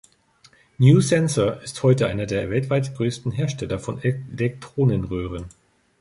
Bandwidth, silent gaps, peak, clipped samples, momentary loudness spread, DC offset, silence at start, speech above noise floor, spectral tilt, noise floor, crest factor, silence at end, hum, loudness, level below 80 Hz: 11.5 kHz; none; -2 dBFS; under 0.1%; 12 LU; under 0.1%; 0.8 s; 35 dB; -6.5 dB/octave; -56 dBFS; 20 dB; 0.5 s; none; -22 LUFS; -46 dBFS